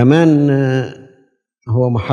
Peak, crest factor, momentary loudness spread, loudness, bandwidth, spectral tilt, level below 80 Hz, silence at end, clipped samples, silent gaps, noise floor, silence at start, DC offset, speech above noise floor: 0 dBFS; 14 dB; 10 LU; -14 LUFS; 7.2 kHz; -8.5 dB/octave; -54 dBFS; 0 s; under 0.1%; none; -57 dBFS; 0 s; under 0.1%; 45 dB